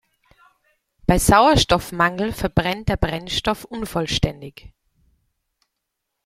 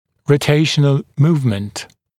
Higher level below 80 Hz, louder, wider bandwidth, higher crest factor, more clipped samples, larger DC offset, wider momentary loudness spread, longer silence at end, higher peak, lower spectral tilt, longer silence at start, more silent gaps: first, -34 dBFS vs -52 dBFS; second, -20 LUFS vs -16 LUFS; first, 16.5 kHz vs 13.5 kHz; about the same, 20 dB vs 16 dB; neither; neither; about the same, 12 LU vs 12 LU; first, 1.75 s vs 0.35 s; about the same, -2 dBFS vs 0 dBFS; second, -4.5 dB/octave vs -6 dB/octave; first, 1.1 s vs 0.3 s; neither